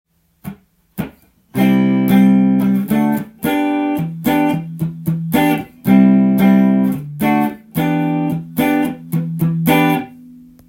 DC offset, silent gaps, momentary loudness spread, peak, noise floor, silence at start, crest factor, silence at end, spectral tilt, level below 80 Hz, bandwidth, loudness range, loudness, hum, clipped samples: under 0.1%; none; 15 LU; 0 dBFS; -40 dBFS; 0.45 s; 14 dB; 0.35 s; -7.5 dB/octave; -50 dBFS; 17 kHz; 3 LU; -15 LUFS; none; under 0.1%